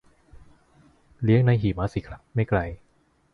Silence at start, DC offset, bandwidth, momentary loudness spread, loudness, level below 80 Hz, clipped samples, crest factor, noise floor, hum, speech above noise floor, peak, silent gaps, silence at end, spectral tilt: 1.2 s; under 0.1%; 6.4 kHz; 15 LU; -24 LUFS; -44 dBFS; under 0.1%; 18 dB; -64 dBFS; none; 41 dB; -8 dBFS; none; 0.6 s; -9.5 dB/octave